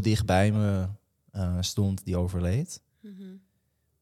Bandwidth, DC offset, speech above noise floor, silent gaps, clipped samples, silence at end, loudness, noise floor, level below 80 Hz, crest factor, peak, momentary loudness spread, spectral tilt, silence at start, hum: 14 kHz; under 0.1%; 47 dB; none; under 0.1%; 0.65 s; -28 LUFS; -73 dBFS; -52 dBFS; 18 dB; -10 dBFS; 22 LU; -6 dB/octave; 0 s; none